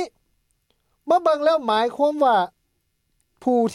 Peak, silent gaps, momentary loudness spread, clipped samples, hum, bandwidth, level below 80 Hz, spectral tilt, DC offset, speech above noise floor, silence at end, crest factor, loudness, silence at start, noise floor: -8 dBFS; none; 12 LU; under 0.1%; none; 12 kHz; -68 dBFS; -5 dB/octave; under 0.1%; 52 dB; 0 s; 14 dB; -20 LUFS; 0 s; -71 dBFS